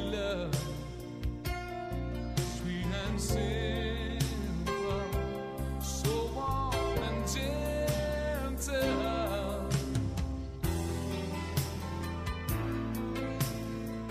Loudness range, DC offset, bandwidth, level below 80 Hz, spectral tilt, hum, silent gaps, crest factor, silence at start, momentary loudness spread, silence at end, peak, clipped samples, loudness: 3 LU; under 0.1%; 15.5 kHz; -40 dBFS; -5.5 dB/octave; none; none; 18 dB; 0 s; 6 LU; 0 s; -16 dBFS; under 0.1%; -34 LUFS